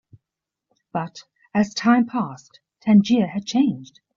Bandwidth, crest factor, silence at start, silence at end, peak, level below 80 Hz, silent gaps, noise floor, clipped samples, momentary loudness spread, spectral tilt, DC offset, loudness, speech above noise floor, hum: 7.4 kHz; 16 dB; 0.95 s; 0.35 s; -6 dBFS; -64 dBFS; none; -86 dBFS; under 0.1%; 14 LU; -6 dB/octave; under 0.1%; -21 LUFS; 66 dB; none